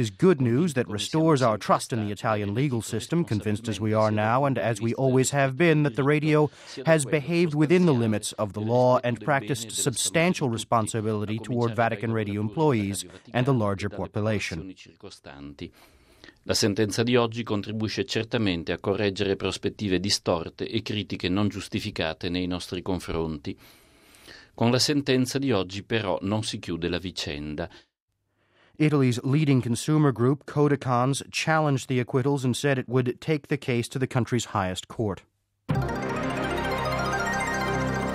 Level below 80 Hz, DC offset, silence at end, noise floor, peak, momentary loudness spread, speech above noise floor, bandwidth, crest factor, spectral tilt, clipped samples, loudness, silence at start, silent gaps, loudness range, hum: -52 dBFS; under 0.1%; 0 s; -77 dBFS; -8 dBFS; 9 LU; 52 dB; 15.5 kHz; 18 dB; -5.5 dB/octave; under 0.1%; -25 LUFS; 0 s; 28.02-28.08 s; 6 LU; none